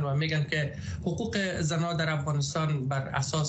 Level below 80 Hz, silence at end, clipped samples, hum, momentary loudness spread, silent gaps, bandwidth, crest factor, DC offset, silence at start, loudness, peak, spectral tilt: -52 dBFS; 0 s; under 0.1%; none; 4 LU; none; 8.4 kHz; 14 dB; under 0.1%; 0 s; -29 LUFS; -14 dBFS; -5 dB/octave